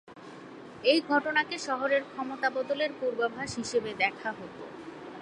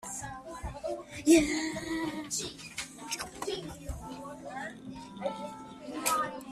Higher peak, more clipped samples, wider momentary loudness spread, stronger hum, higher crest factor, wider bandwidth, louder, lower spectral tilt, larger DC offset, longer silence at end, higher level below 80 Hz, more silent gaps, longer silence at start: about the same, -10 dBFS vs -10 dBFS; neither; about the same, 18 LU vs 18 LU; neither; about the same, 20 dB vs 24 dB; second, 11.5 kHz vs 15 kHz; first, -29 LUFS vs -33 LUFS; about the same, -3.5 dB/octave vs -3.5 dB/octave; neither; about the same, 0 s vs 0 s; second, -68 dBFS vs -54 dBFS; neither; about the same, 0.05 s vs 0 s